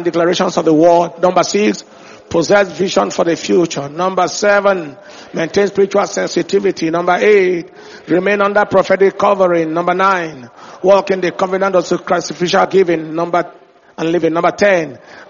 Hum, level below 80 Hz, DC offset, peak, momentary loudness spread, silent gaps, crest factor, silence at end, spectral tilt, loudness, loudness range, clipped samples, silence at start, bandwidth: none; -54 dBFS; under 0.1%; 0 dBFS; 7 LU; none; 14 dB; 0.05 s; -4 dB/octave; -14 LUFS; 2 LU; under 0.1%; 0 s; 7.4 kHz